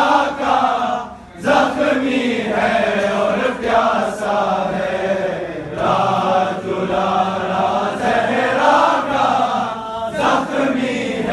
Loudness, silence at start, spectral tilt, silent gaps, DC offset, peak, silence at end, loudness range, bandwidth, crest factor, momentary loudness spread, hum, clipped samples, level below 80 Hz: -17 LUFS; 0 s; -5 dB/octave; none; under 0.1%; -2 dBFS; 0 s; 2 LU; 12 kHz; 16 dB; 6 LU; none; under 0.1%; -48 dBFS